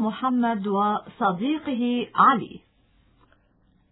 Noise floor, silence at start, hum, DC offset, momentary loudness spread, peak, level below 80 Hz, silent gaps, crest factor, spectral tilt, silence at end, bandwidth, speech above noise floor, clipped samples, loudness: -62 dBFS; 0 s; none; under 0.1%; 8 LU; -4 dBFS; -64 dBFS; none; 20 dB; -10 dB/octave; 1.35 s; 4.1 kHz; 39 dB; under 0.1%; -23 LUFS